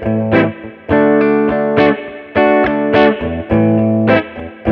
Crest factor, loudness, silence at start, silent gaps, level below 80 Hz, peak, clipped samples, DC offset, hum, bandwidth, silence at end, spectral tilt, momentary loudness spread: 12 dB; -13 LUFS; 0 s; none; -38 dBFS; 0 dBFS; under 0.1%; under 0.1%; none; 5.8 kHz; 0 s; -9.5 dB/octave; 8 LU